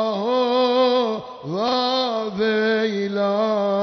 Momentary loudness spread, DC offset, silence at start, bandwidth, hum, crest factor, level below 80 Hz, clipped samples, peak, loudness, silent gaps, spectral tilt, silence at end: 6 LU; under 0.1%; 0 s; 6.4 kHz; none; 12 dB; -66 dBFS; under 0.1%; -8 dBFS; -21 LUFS; none; -5.5 dB/octave; 0 s